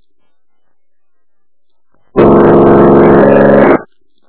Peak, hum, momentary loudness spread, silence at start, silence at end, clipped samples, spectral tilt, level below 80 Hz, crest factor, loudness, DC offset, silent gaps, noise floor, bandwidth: 0 dBFS; none; 5 LU; 2.15 s; 0.45 s; 3%; -12 dB/octave; -32 dBFS; 8 dB; -6 LUFS; under 0.1%; none; -74 dBFS; 4 kHz